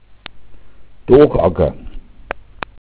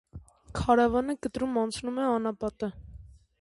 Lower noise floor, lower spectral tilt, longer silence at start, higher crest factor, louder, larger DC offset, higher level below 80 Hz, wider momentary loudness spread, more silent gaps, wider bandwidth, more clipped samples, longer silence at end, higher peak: second, -40 dBFS vs -50 dBFS; first, -11.5 dB/octave vs -6 dB/octave; first, 0.35 s vs 0.15 s; about the same, 18 dB vs 20 dB; first, -13 LUFS vs -28 LUFS; neither; first, -32 dBFS vs -48 dBFS; first, 27 LU vs 13 LU; neither; second, 4 kHz vs 11.5 kHz; neither; second, 0.2 s vs 0.35 s; first, 0 dBFS vs -8 dBFS